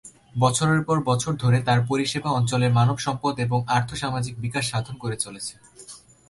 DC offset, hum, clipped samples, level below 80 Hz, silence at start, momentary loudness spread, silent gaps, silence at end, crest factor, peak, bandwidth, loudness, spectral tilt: under 0.1%; none; under 0.1%; -54 dBFS; 0.05 s; 12 LU; none; 0.3 s; 16 dB; -6 dBFS; 11.5 kHz; -23 LUFS; -5 dB/octave